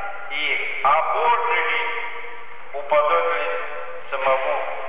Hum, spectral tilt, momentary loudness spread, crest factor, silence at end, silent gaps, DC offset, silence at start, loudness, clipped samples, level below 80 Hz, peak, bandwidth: none; -5 dB/octave; 15 LU; 14 dB; 0 s; none; 4%; 0 s; -21 LUFS; under 0.1%; -70 dBFS; -8 dBFS; 4 kHz